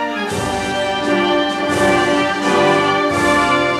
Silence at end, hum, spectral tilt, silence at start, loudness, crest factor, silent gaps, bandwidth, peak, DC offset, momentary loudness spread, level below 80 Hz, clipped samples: 0 s; none; -4 dB/octave; 0 s; -15 LUFS; 14 dB; none; 13.5 kHz; -2 dBFS; under 0.1%; 6 LU; -44 dBFS; under 0.1%